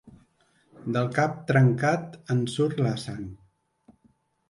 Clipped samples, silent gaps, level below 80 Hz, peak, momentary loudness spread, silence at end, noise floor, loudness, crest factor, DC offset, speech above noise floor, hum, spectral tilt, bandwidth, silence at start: under 0.1%; none; -60 dBFS; -8 dBFS; 16 LU; 1.15 s; -65 dBFS; -25 LUFS; 20 dB; under 0.1%; 41 dB; none; -7 dB/octave; 11.5 kHz; 0.05 s